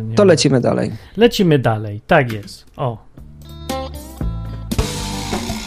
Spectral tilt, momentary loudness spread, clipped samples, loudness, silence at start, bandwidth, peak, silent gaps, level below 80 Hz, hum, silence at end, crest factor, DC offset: -5.5 dB/octave; 16 LU; under 0.1%; -17 LUFS; 0 s; 15.5 kHz; 0 dBFS; none; -32 dBFS; none; 0 s; 18 dB; under 0.1%